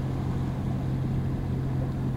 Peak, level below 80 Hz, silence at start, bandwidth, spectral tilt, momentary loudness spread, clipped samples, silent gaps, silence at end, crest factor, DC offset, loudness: -18 dBFS; -38 dBFS; 0 s; 7.8 kHz; -9 dB/octave; 1 LU; under 0.1%; none; 0 s; 10 dB; under 0.1%; -30 LUFS